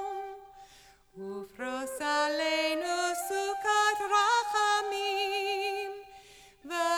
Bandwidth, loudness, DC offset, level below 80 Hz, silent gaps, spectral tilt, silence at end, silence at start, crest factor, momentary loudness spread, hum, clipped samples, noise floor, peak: 20 kHz; -29 LUFS; under 0.1%; -68 dBFS; none; -1 dB/octave; 0 s; 0 s; 16 dB; 15 LU; none; under 0.1%; -58 dBFS; -14 dBFS